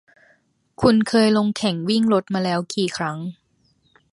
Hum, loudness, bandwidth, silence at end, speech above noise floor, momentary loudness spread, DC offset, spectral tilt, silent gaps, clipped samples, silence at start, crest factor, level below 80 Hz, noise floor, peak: none; -20 LUFS; 11.5 kHz; 0.8 s; 44 dB; 10 LU; under 0.1%; -5.5 dB/octave; none; under 0.1%; 0.8 s; 18 dB; -54 dBFS; -63 dBFS; -2 dBFS